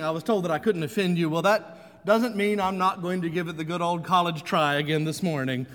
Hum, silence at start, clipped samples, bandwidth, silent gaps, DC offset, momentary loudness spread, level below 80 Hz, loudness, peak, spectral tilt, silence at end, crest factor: none; 0 s; under 0.1%; 19.5 kHz; none; under 0.1%; 6 LU; -64 dBFS; -25 LUFS; -8 dBFS; -6 dB/octave; 0 s; 18 dB